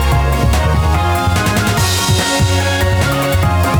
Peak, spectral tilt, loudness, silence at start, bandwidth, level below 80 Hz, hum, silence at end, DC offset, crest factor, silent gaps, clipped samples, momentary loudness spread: -4 dBFS; -4.5 dB/octave; -13 LUFS; 0 s; over 20 kHz; -20 dBFS; none; 0 s; under 0.1%; 10 dB; none; under 0.1%; 1 LU